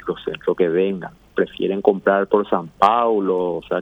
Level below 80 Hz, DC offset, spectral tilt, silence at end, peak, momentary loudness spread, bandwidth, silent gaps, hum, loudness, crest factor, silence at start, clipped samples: -56 dBFS; under 0.1%; -7.5 dB/octave; 0 s; 0 dBFS; 8 LU; 7.8 kHz; none; none; -19 LUFS; 18 dB; 0.05 s; under 0.1%